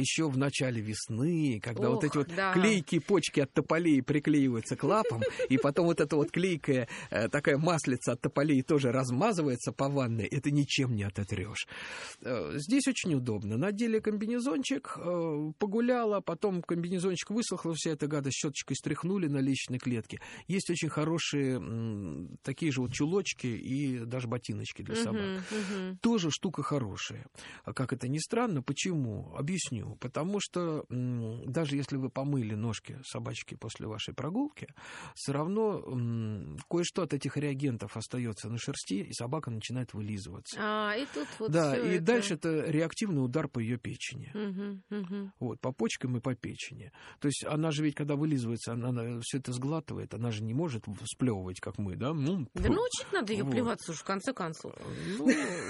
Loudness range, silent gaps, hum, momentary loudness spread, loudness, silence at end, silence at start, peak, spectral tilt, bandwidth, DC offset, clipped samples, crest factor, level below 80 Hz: 7 LU; none; none; 10 LU; -32 LUFS; 0 s; 0 s; -14 dBFS; -5.5 dB/octave; 11.5 kHz; under 0.1%; under 0.1%; 18 dB; -58 dBFS